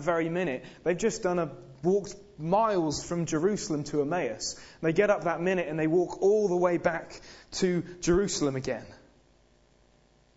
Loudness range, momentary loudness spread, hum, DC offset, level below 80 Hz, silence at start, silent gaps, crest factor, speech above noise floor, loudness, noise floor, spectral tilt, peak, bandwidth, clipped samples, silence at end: 3 LU; 10 LU; none; under 0.1%; -54 dBFS; 0 s; none; 18 dB; 35 dB; -28 LUFS; -63 dBFS; -5 dB/octave; -10 dBFS; 8 kHz; under 0.1%; 1.4 s